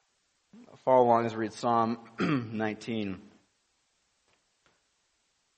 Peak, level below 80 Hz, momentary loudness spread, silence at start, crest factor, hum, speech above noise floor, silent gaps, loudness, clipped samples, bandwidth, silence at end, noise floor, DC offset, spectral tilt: -10 dBFS; -74 dBFS; 12 LU; 0.55 s; 22 dB; none; 47 dB; none; -29 LUFS; under 0.1%; 8.4 kHz; 2.35 s; -75 dBFS; under 0.1%; -6.5 dB/octave